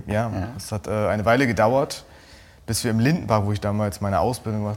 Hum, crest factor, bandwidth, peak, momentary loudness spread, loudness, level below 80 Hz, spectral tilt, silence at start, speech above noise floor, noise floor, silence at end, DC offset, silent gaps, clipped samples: none; 20 dB; 17 kHz; -2 dBFS; 11 LU; -23 LUFS; -46 dBFS; -6 dB/octave; 0 s; 26 dB; -48 dBFS; 0 s; under 0.1%; none; under 0.1%